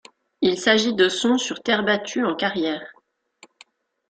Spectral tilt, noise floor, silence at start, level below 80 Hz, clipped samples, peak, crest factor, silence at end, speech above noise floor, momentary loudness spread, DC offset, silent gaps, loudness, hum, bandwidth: -3.5 dB/octave; -55 dBFS; 0.4 s; -66 dBFS; under 0.1%; -2 dBFS; 20 dB; 1.2 s; 34 dB; 7 LU; under 0.1%; none; -21 LUFS; none; 9.4 kHz